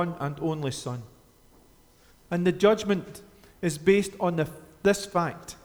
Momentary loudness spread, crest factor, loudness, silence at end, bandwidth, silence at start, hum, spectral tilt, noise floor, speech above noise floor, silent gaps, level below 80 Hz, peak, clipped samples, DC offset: 12 LU; 20 dB; -27 LUFS; 0.1 s; over 20 kHz; 0 s; none; -5.5 dB/octave; -57 dBFS; 31 dB; none; -58 dBFS; -8 dBFS; under 0.1%; under 0.1%